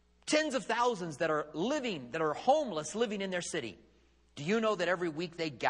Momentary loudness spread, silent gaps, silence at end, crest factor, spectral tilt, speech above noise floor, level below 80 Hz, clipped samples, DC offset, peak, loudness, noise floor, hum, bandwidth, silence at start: 8 LU; none; 0 s; 18 dB; -4 dB/octave; 27 dB; -68 dBFS; under 0.1%; under 0.1%; -14 dBFS; -33 LUFS; -60 dBFS; none; 11 kHz; 0.25 s